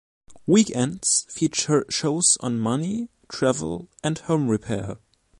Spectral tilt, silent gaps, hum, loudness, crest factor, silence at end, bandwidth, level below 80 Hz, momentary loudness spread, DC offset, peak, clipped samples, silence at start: -4 dB/octave; none; none; -23 LUFS; 18 dB; 0.45 s; 11.5 kHz; -56 dBFS; 13 LU; under 0.1%; -6 dBFS; under 0.1%; 0.3 s